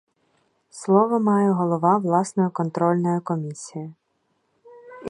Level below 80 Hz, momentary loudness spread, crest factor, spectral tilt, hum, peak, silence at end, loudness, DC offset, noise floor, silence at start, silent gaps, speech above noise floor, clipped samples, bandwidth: -72 dBFS; 15 LU; 20 dB; -8 dB/octave; none; -4 dBFS; 0 s; -21 LUFS; under 0.1%; -70 dBFS; 0.75 s; none; 50 dB; under 0.1%; 11 kHz